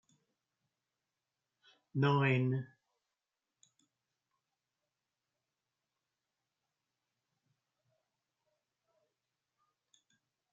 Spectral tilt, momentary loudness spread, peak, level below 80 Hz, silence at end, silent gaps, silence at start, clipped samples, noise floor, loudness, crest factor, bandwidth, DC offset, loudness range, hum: -6 dB/octave; 13 LU; -18 dBFS; -86 dBFS; 7.9 s; none; 1.95 s; under 0.1%; under -90 dBFS; -33 LUFS; 24 dB; 7.2 kHz; under 0.1%; 4 LU; none